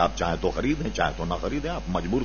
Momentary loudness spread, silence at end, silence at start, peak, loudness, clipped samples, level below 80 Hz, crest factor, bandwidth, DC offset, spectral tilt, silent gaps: 4 LU; 0 s; 0 s; -8 dBFS; -27 LUFS; under 0.1%; -36 dBFS; 18 dB; 7 kHz; 0.5%; -5.5 dB/octave; none